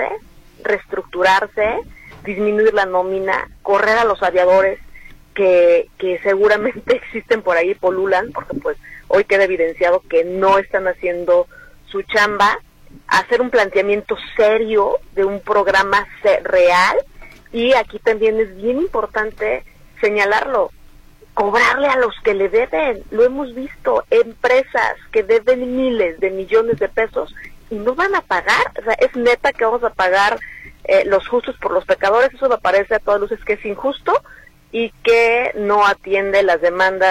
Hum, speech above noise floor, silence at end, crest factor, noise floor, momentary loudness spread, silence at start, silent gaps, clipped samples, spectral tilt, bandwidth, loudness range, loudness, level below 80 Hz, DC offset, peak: none; 27 dB; 0 s; 14 dB; -43 dBFS; 10 LU; 0 s; none; under 0.1%; -4 dB/octave; 14.5 kHz; 2 LU; -16 LUFS; -44 dBFS; under 0.1%; -4 dBFS